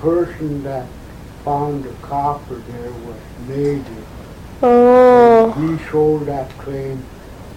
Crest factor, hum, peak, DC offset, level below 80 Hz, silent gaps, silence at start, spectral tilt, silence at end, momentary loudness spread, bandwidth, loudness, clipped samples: 16 dB; none; 0 dBFS; under 0.1%; -40 dBFS; none; 0 s; -8 dB/octave; 0 s; 25 LU; 11.5 kHz; -15 LUFS; under 0.1%